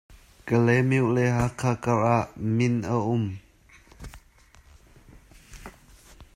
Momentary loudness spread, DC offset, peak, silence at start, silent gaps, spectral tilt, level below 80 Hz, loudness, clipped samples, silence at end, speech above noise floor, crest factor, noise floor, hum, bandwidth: 24 LU; under 0.1%; -8 dBFS; 0.1 s; none; -7.5 dB/octave; -50 dBFS; -24 LUFS; under 0.1%; 0.1 s; 32 dB; 18 dB; -55 dBFS; none; 12 kHz